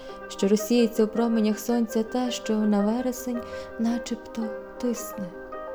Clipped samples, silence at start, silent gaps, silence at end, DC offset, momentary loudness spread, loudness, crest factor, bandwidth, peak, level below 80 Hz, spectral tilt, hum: under 0.1%; 0 s; none; 0 s; under 0.1%; 12 LU; -26 LUFS; 16 dB; over 20 kHz; -10 dBFS; -56 dBFS; -5.5 dB/octave; none